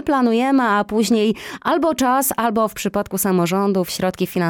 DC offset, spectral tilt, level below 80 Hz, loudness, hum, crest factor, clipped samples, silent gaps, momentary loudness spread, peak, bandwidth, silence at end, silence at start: under 0.1%; -5 dB/octave; -52 dBFS; -18 LUFS; none; 12 dB; under 0.1%; none; 5 LU; -6 dBFS; 17.5 kHz; 0 s; 0 s